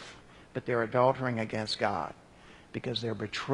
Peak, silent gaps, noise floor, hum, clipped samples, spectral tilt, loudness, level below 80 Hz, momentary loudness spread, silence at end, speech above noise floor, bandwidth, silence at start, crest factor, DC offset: -12 dBFS; none; -55 dBFS; none; under 0.1%; -5.5 dB/octave; -32 LUFS; -64 dBFS; 15 LU; 0 s; 24 dB; 11 kHz; 0 s; 22 dB; under 0.1%